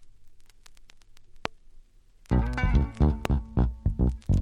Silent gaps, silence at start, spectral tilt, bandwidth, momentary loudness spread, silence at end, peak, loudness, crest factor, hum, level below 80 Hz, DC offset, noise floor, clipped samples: none; 0 s; -8 dB/octave; 8.4 kHz; 13 LU; 0 s; -6 dBFS; -28 LUFS; 22 dB; none; -30 dBFS; under 0.1%; -55 dBFS; under 0.1%